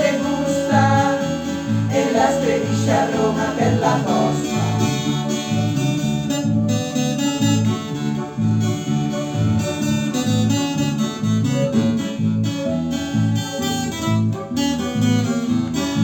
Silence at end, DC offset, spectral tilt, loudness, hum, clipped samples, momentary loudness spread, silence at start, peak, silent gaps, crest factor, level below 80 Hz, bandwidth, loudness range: 0 s; under 0.1%; -5.5 dB/octave; -20 LUFS; none; under 0.1%; 5 LU; 0 s; -4 dBFS; none; 16 dB; -52 dBFS; 17 kHz; 2 LU